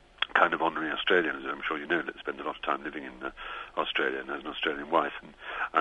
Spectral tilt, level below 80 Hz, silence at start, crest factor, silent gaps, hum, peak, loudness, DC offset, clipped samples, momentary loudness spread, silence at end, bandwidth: -5 dB/octave; -60 dBFS; 0.2 s; 26 dB; none; none; -6 dBFS; -30 LUFS; under 0.1%; under 0.1%; 13 LU; 0 s; 9.8 kHz